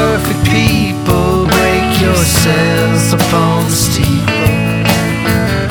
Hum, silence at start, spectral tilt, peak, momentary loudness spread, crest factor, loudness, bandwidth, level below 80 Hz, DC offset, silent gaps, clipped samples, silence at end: none; 0 s; -5 dB/octave; 0 dBFS; 3 LU; 10 dB; -11 LUFS; over 20 kHz; -26 dBFS; under 0.1%; none; under 0.1%; 0 s